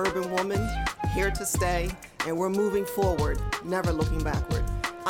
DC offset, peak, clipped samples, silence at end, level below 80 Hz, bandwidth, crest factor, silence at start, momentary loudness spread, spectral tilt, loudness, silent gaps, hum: under 0.1%; -12 dBFS; under 0.1%; 0 s; -34 dBFS; 18 kHz; 14 dB; 0 s; 5 LU; -5 dB/octave; -28 LUFS; none; none